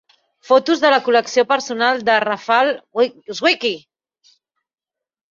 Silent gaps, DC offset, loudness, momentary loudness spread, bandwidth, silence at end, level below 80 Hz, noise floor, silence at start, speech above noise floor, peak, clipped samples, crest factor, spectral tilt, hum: none; under 0.1%; -17 LUFS; 6 LU; 7.6 kHz; 1.5 s; -68 dBFS; -87 dBFS; 0.5 s; 71 dB; -2 dBFS; under 0.1%; 16 dB; -2.5 dB/octave; none